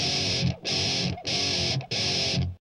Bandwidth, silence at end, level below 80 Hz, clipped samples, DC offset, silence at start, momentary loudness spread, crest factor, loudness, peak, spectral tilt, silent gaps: 11.5 kHz; 0.1 s; -48 dBFS; under 0.1%; under 0.1%; 0 s; 3 LU; 14 dB; -25 LUFS; -14 dBFS; -3 dB/octave; none